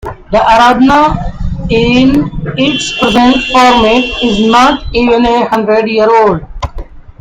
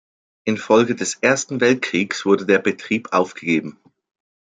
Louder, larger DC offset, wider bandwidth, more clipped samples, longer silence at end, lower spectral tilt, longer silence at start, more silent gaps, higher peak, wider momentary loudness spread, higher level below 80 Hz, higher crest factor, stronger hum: first, -8 LUFS vs -19 LUFS; neither; first, 13 kHz vs 9.4 kHz; first, 0.6% vs under 0.1%; second, 0.2 s vs 0.8 s; about the same, -5 dB/octave vs -4 dB/octave; second, 0.05 s vs 0.45 s; neither; about the same, 0 dBFS vs -2 dBFS; first, 11 LU vs 8 LU; first, -26 dBFS vs -66 dBFS; second, 8 dB vs 18 dB; neither